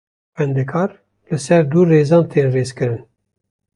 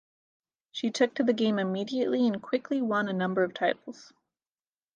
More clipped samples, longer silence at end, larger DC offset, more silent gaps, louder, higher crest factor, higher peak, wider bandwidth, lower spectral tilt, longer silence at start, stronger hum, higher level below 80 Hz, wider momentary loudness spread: neither; second, 0.75 s vs 0.9 s; neither; neither; first, -16 LUFS vs -28 LUFS; about the same, 14 dB vs 18 dB; first, -2 dBFS vs -12 dBFS; first, 11 kHz vs 9 kHz; first, -7.5 dB/octave vs -5.5 dB/octave; second, 0.4 s vs 0.75 s; neither; first, -56 dBFS vs -78 dBFS; first, 12 LU vs 7 LU